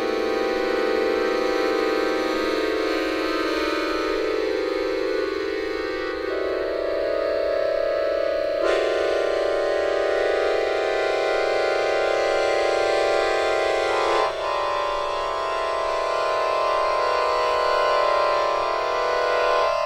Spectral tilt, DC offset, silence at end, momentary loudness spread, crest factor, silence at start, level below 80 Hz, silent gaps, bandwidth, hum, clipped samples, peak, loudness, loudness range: -3.5 dB/octave; under 0.1%; 0 s; 4 LU; 16 dB; 0 s; -48 dBFS; none; 15.5 kHz; 60 Hz at -55 dBFS; under 0.1%; -8 dBFS; -22 LUFS; 3 LU